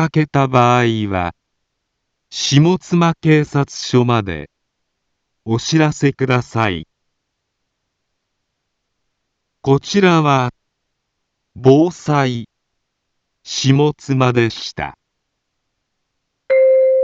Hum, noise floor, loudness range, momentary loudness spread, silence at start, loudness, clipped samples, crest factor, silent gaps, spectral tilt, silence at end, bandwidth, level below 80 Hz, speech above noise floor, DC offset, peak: none; -74 dBFS; 4 LU; 13 LU; 0 s; -15 LUFS; under 0.1%; 16 dB; none; -6 dB/octave; 0 s; 7.8 kHz; -50 dBFS; 59 dB; under 0.1%; 0 dBFS